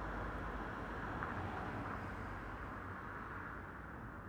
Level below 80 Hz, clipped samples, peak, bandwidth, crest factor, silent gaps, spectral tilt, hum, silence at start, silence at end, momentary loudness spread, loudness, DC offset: -54 dBFS; under 0.1%; -26 dBFS; over 20 kHz; 18 dB; none; -7 dB/octave; none; 0 s; 0 s; 5 LU; -46 LUFS; under 0.1%